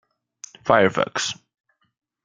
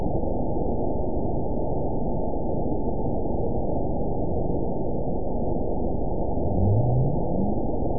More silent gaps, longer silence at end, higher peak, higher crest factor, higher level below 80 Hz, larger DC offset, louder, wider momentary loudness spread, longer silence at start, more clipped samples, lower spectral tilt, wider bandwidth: neither; first, 0.9 s vs 0 s; first, -2 dBFS vs -10 dBFS; first, 22 dB vs 14 dB; second, -62 dBFS vs -32 dBFS; second, under 0.1% vs 5%; first, -21 LUFS vs -27 LUFS; first, 24 LU vs 5 LU; first, 0.65 s vs 0 s; neither; second, -3.5 dB/octave vs -19 dB/octave; first, 9.6 kHz vs 1 kHz